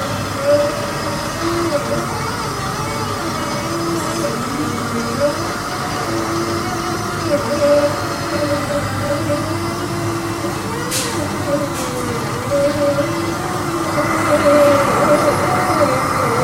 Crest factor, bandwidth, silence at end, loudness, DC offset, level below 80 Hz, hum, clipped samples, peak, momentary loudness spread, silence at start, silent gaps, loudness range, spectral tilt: 18 dB; 16 kHz; 0 s; -18 LUFS; under 0.1%; -40 dBFS; none; under 0.1%; 0 dBFS; 7 LU; 0 s; none; 5 LU; -4.5 dB/octave